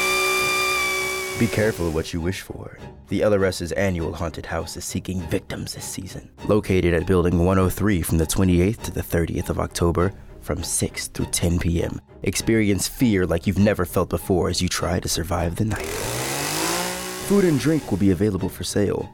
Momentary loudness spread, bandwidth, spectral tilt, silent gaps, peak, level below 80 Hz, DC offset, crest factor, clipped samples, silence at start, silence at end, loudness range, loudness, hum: 10 LU; 20 kHz; -5 dB/octave; none; -8 dBFS; -40 dBFS; under 0.1%; 14 dB; under 0.1%; 0 s; 0 s; 4 LU; -22 LUFS; none